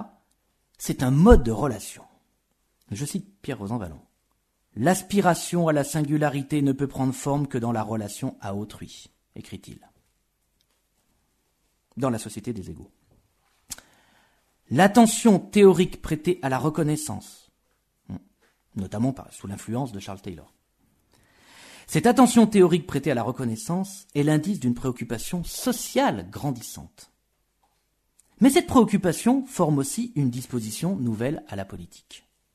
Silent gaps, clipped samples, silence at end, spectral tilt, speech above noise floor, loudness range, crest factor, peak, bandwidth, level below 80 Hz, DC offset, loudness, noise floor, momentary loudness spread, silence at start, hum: none; under 0.1%; 0.35 s; -6 dB/octave; 49 dB; 14 LU; 24 dB; 0 dBFS; 13.5 kHz; -40 dBFS; under 0.1%; -23 LUFS; -72 dBFS; 23 LU; 0 s; none